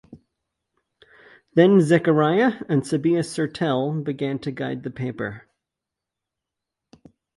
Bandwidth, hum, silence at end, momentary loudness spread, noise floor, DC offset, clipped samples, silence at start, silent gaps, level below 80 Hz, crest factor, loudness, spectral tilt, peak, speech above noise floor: 11.5 kHz; none; 2 s; 13 LU; -86 dBFS; under 0.1%; under 0.1%; 0.1 s; none; -64 dBFS; 20 dB; -21 LUFS; -7 dB/octave; -2 dBFS; 65 dB